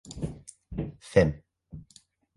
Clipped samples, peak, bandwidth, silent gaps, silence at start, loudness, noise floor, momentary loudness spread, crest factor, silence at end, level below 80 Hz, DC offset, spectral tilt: under 0.1%; -6 dBFS; 11.5 kHz; none; 0.05 s; -29 LUFS; -60 dBFS; 24 LU; 24 dB; 0.55 s; -46 dBFS; under 0.1%; -7 dB/octave